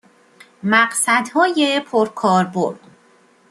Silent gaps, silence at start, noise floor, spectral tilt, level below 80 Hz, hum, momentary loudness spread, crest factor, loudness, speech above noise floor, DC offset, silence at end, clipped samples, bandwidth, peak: none; 0.65 s; -53 dBFS; -3.5 dB/octave; -68 dBFS; none; 8 LU; 18 dB; -17 LUFS; 36 dB; under 0.1%; 0.75 s; under 0.1%; 13 kHz; -2 dBFS